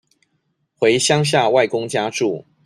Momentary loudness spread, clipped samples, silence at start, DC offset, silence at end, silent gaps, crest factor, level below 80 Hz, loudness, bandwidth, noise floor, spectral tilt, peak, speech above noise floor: 7 LU; under 0.1%; 0.8 s; under 0.1%; 0.25 s; none; 16 dB; -60 dBFS; -17 LUFS; 14 kHz; -69 dBFS; -4 dB/octave; -2 dBFS; 52 dB